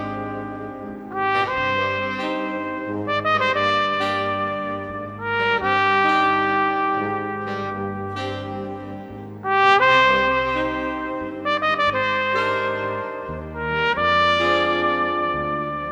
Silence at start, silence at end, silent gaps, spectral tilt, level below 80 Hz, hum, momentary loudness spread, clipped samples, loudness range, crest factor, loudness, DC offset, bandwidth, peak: 0 s; 0 s; none; -5 dB/octave; -48 dBFS; none; 13 LU; under 0.1%; 4 LU; 18 dB; -21 LUFS; under 0.1%; 10.5 kHz; -4 dBFS